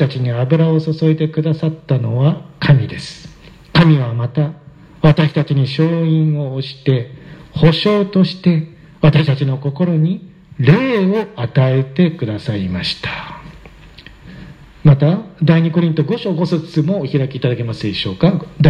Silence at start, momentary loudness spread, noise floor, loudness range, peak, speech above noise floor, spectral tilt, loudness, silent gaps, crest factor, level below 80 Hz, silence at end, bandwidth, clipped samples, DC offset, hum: 0 s; 8 LU; -39 dBFS; 3 LU; 0 dBFS; 25 dB; -8.5 dB/octave; -15 LUFS; none; 14 dB; -44 dBFS; 0 s; 7 kHz; under 0.1%; under 0.1%; none